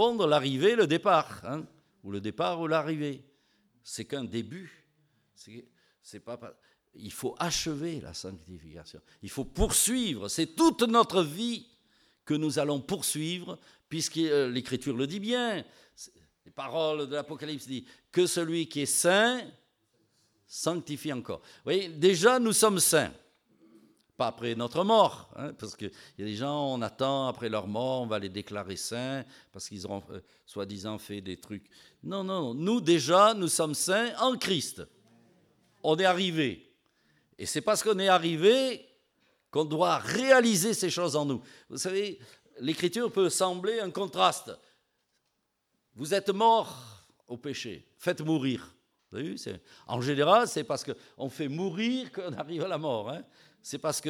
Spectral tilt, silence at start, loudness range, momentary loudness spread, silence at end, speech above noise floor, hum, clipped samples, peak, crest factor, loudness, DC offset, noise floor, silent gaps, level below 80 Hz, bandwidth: -3.5 dB/octave; 0 s; 10 LU; 19 LU; 0 s; 50 dB; none; under 0.1%; -6 dBFS; 22 dB; -28 LUFS; under 0.1%; -79 dBFS; none; -56 dBFS; 18 kHz